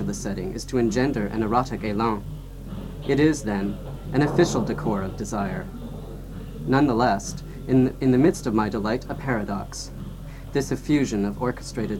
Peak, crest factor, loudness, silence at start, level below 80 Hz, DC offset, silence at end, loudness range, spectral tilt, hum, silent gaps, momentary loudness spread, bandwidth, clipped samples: -6 dBFS; 18 dB; -24 LUFS; 0 s; -40 dBFS; 0.1%; 0 s; 3 LU; -6 dB/octave; none; none; 16 LU; 17 kHz; under 0.1%